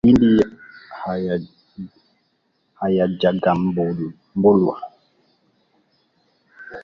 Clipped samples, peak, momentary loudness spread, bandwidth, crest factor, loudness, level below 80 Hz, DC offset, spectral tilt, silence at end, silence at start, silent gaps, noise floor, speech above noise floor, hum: under 0.1%; -2 dBFS; 23 LU; 7.2 kHz; 18 dB; -19 LUFS; -48 dBFS; under 0.1%; -9 dB/octave; 0.05 s; 0.05 s; none; -67 dBFS; 50 dB; none